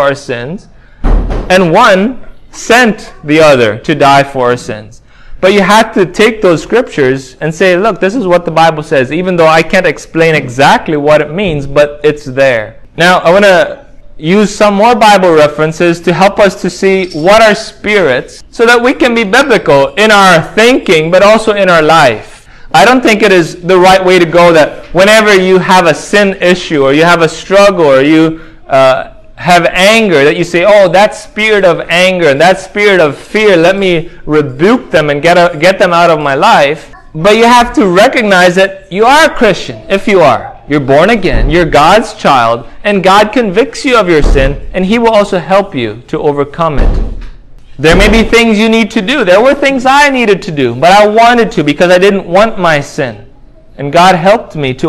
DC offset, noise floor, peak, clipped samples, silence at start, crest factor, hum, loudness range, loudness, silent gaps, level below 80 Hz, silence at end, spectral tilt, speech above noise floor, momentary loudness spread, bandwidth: under 0.1%; -34 dBFS; 0 dBFS; 5%; 0 s; 6 dB; none; 3 LU; -7 LUFS; none; -24 dBFS; 0 s; -5 dB/octave; 27 dB; 9 LU; 16 kHz